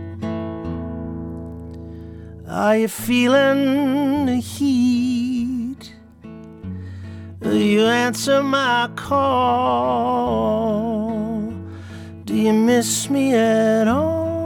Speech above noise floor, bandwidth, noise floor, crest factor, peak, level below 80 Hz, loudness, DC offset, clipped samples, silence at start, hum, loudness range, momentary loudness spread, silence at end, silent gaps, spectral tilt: 24 dB; 18 kHz; -41 dBFS; 14 dB; -6 dBFS; -46 dBFS; -19 LUFS; under 0.1%; under 0.1%; 0 s; none; 4 LU; 19 LU; 0 s; none; -5 dB/octave